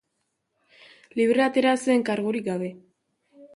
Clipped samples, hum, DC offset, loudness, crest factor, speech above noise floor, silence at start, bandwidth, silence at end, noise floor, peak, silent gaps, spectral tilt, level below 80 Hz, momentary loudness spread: under 0.1%; none; under 0.1%; -24 LUFS; 18 dB; 54 dB; 1.15 s; 11.5 kHz; 0.1 s; -77 dBFS; -8 dBFS; none; -5 dB/octave; -72 dBFS; 12 LU